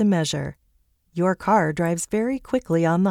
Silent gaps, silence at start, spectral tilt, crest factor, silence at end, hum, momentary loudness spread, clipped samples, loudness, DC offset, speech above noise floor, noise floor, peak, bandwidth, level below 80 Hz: none; 0 s; -6 dB/octave; 16 dB; 0 s; none; 8 LU; under 0.1%; -22 LUFS; under 0.1%; 43 dB; -64 dBFS; -6 dBFS; 15 kHz; -52 dBFS